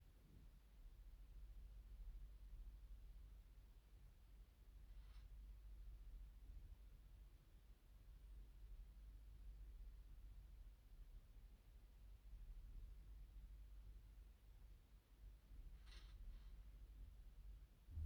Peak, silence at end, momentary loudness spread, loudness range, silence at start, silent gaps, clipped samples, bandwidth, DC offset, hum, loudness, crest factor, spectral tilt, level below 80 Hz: -42 dBFS; 0 s; 6 LU; 1 LU; 0 s; none; under 0.1%; 19.5 kHz; under 0.1%; none; -65 LUFS; 18 dB; -6 dB/octave; -60 dBFS